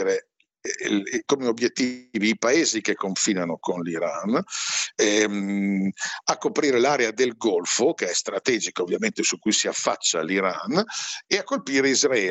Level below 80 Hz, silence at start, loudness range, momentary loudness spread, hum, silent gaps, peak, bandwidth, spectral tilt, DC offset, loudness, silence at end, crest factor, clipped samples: -76 dBFS; 0 s; 1 LU; 7 LU; none; none; -4 dBFS; 8.4 kHz; -2.5 dB/octave; under 0.1%; -23 LUFS; 0 s; 18 dB; under 0.1%